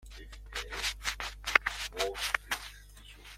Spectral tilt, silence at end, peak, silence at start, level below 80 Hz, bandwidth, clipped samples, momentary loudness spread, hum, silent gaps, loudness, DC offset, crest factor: -1 dB/octave; 0 s; -2 dBFS; 0 s; -48 dBFS; 16.5 kHz; under 0.1%; 22 LU; none; none; -33 LUFS; under 0.1%; 34 dB